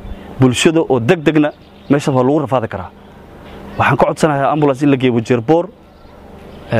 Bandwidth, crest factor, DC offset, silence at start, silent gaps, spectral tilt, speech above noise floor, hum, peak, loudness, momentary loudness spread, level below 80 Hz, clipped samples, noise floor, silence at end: 15 kHz; 14 dB; under 0.1%; 0 s; none; -6 dB/octave; 26 dB; none; 0 dBFS; -14 LUFS; 16 LU; -42 dBFS; under 0.1%; -39 dBFS; 0 s